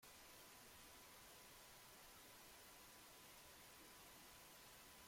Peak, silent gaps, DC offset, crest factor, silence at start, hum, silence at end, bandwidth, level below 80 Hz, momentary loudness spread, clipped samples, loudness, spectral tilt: -52 dBFS; none; under 0.1%; 12 dB; 0 s; none; 0 s; 16.5 kHz; -80 dBFS; 0 LU; under 0.1%; -62 LUFS; -1.5 dB/octave